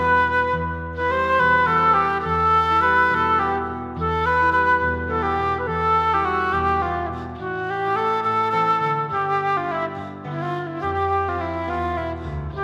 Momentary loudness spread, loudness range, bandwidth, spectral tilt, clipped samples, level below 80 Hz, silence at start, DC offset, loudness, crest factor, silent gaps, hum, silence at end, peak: 11 LU; 5 LU; 12.5 kHz; -6.5 dB/octave; under 0.1%; -40 dBFS; 0 s; under 0.1%; -21 LUFS; 14 dB; none; none; 0 s; -8 dBFS